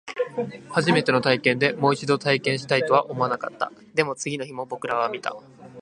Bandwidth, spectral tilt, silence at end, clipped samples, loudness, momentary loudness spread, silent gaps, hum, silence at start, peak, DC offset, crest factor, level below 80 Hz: 11 kHz; -5 dB/octave; 0 s; under 0.1%; -23 LUFS; 11 LU; none; none; 0.05 s; -2 dBFS; under 0.1%; 22 dB; -68 dBFS